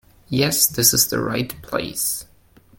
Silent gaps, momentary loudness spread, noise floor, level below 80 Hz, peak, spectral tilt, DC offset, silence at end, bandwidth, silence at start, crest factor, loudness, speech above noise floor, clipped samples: none; 12 LU; -52 dBFS; -50 dBFS; 0 dBFS; -2.5 dB/octave; under 0.1%; 0.55 s; 17 kHz; 0.3 s; 22 dB; -19 LUFS; 32 dB; under 0.1%